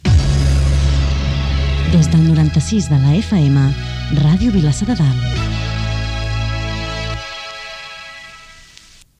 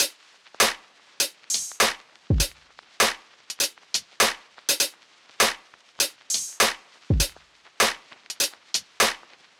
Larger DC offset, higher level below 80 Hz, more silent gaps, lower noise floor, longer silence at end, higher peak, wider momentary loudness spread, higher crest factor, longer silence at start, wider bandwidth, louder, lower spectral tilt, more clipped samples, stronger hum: neither; first, -22 dBFS vs -40 dBFS; neither; second, -44 dBFS vs -54 dBFS; first, 0.7 s vs 0.4 s; about the same, -2 dBFS vs -4 dBFS; about the same, 15 LU vs 16 LU; second, 14 dB vs 22 dB; about the same, 0.05 s vs 0 s; second, 11 kHz vs over 20 kHz; first, -16 LUFS vs -24 LUFS; first, -6.5 dB/octave vs -1.5 dB/octave; neither; neither